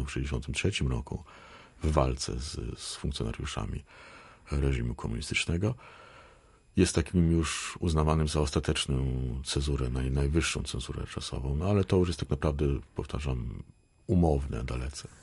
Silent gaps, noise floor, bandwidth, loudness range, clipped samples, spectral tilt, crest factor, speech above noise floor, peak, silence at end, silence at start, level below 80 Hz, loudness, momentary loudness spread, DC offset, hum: none; -58 dBFS; 11.5 kHz; 5 LU; under 0.1%; -5.5 dB/octave; 22 dB; 29 dB; -8 dBFS; 0.1 s; 0 s; -36 dBFS; -31 LUFS; 14 LU; under 0.1%; none